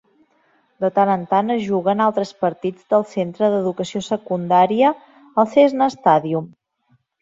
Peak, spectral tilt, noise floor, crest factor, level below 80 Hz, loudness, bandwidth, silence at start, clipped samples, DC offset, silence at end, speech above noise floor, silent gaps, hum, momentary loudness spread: -2 dBFS; -6.5 dB/octave; -62 dBFS; 18 dB; -66 dBFS; -19 LUFS; 7.8 kHz; 0.8 s; under 0.1%; under 0.1%; 0.75 s; 45 dB; none; none; 10 LU